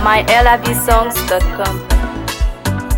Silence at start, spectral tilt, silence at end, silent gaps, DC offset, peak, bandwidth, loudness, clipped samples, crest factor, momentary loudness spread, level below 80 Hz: 0 s; -4 dB/octave; 0 s; none; under 0.1%; 0 dBFS; 19 kHz; -14 LUFS; under 0.1%; 14 dB; 10 LU; -18 dBFS